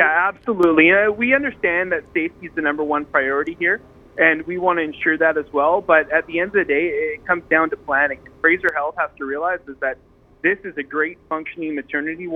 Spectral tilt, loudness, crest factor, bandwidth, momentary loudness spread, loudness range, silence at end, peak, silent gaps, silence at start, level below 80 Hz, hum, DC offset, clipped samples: -7 dB/octave; -19 LUFS; 20 dB; 4.9 kHz; 10 LU; 4 LU; 0 s; 0 dBFS; none; 0 s; -54 dBFS; none; under 0.1%; under 0.1%